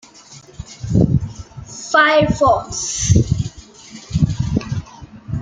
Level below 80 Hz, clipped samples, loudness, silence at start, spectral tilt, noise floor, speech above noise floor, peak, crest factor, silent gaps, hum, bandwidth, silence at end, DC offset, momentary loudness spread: -34 dBFS; under 0.1%; -17 LUFS; 0.3 s; -5 dB/octave; -42 dBFS; 28 dB; -2 dBFS; 16 dB; none; none; 9.4 kHz; 0 s; under 0.1%; 23 LU